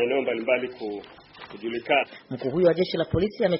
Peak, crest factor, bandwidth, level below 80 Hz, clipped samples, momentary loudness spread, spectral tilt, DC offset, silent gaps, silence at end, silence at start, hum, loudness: -8 dBFS; 18 dB; 5.8 kHz; -52 dBFS; under 0.1%; 14 LU; -4 dB/octave; under 0.1%; none; 0 s; 0 s; none; -26 LUFS